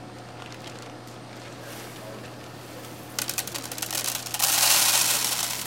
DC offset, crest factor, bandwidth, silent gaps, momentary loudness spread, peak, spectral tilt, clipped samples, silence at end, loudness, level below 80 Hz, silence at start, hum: under 0.1%; 26 dB; 17 kHz; none; 23 LU; -2 dBFS; 0 dB/octave; under 0.1%; 0 s; -22 LUFS; -64 dBFS; 0 s; none